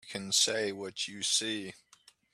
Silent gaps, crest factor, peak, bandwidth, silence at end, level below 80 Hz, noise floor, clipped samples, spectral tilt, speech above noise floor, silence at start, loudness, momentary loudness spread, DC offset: none; 20 dB; -14 dBFS; 14.5 kHz; 0.6 s; -78 dBFS; -63 dBFS; under 0.1%; -1 dB/octave; 30 dB; 0.05 s; -30 LUFS; 11 LU; under 0.1%